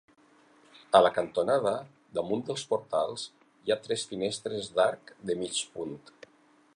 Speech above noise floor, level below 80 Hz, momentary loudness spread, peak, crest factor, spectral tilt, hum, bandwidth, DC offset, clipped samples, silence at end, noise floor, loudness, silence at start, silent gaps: 34 dB; -70 dBFS; 15 LU; -6 dBFS; 24 dB; -3.5 dB/octave; none; 11 kHz; under 0.1%; under 0.1%; 0.8 s; -63 dBFS; -30 LUFS; 0.9 s; none